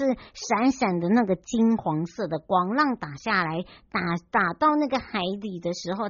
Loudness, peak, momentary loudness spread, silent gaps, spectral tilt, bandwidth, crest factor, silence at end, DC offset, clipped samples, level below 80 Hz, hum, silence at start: -25 LUFS; -8 dBFS; 9 LU; none; -4.5 dB/octave; 7.2 kHz; 16 dB; 0 s; under 0.1%; under 0.1%; -58 dBFS; none; 0 s